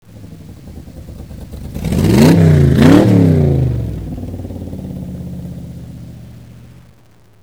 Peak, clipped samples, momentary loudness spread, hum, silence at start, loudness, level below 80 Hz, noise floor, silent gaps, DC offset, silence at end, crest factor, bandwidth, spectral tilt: 0 dBFS; under 0.1%; 26 LU; none; 0.15 s; -11 LUFS; -30 dBFS; -48 dBFS; none; 0.4%; 0.9 s; 14 dB; 16.5 kHz; -7.5 dB/octave